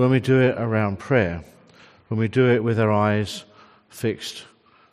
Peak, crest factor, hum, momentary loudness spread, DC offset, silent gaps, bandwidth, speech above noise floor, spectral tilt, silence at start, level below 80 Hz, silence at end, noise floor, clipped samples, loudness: -6 dBFS; 16 dB; none; 14 LU; under 0.1%; none; 14 kHz; 31 dB; -7 dB/octave; 0 s; -58 dBFS; 0.5 s; -51 dBFS; under 0.1%; -21 LUFS